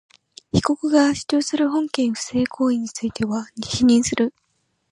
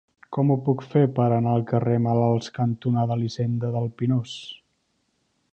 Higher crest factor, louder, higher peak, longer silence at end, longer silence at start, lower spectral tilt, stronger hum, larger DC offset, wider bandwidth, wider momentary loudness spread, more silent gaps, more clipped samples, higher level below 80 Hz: about the same, 18 dB vs 16 dB; about the same, -21 LUFS vs -23 LUFS; first, -2 dBFS vs -8 dBFS; second, 0.6 s vs 0.95 s; first, 0.55 s vs 0.3 s; second, -4.5 dB/octave vs -8.5 dB/octave; neither; neither; first, 11.5 kHz vs 8.2 kHz; about the same, 8 LU vs 6 LU; neither; neither; first, -50 dBFS vs -60 dBFS